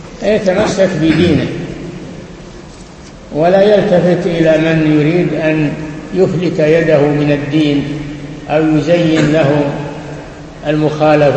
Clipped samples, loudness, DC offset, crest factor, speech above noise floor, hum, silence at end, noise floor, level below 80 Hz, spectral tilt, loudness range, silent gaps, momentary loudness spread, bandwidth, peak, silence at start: under 0.1%; -12 LUFS; under 0.1%; 12 dB; 22 dB; none; 0 s; -33 dBFS; -38 dBFS; -7 dB/octave; 3 LU; none; 17 LU; 8.6 kHz; 0 dBFS; 0 s